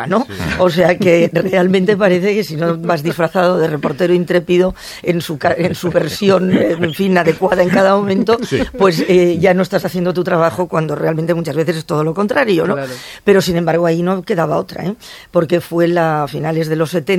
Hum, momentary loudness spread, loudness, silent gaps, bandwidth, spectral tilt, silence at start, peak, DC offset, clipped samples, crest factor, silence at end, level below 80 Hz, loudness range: none; 6 LU; -14 LUFS; none; 16.5 kHz; -6.5 dB/octave; 0 s; 0 dBFS; under 0.1%; under 0.1%; 14 dB; 0 s; -44 dBFS; 3 LU